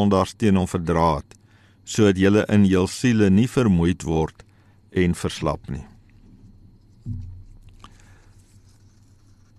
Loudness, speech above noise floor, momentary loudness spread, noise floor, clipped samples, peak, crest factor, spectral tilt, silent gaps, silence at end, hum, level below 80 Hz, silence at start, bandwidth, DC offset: -20 LUFS; 33 dB; 18 LU; -52 dBFS; under 0.1%; -6 dBFS; 16 dB; -6.5 dB/octave; none; 2.15 s; none; -42 dBFS; 0 s; 13 kHz; under 0.1%